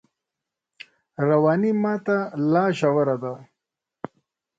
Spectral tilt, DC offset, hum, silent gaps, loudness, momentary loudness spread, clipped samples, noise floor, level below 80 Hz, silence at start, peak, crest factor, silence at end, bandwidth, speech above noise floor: -8 dB/octave; under 0.1%; none; none; -22 LUFS; 20 LU; under 0.1%; -86 dBFS; -68 dBFS; 1.2 s; -8 dBFS; 16 dB; 1.15 s; 7.8 kHz; 65 dB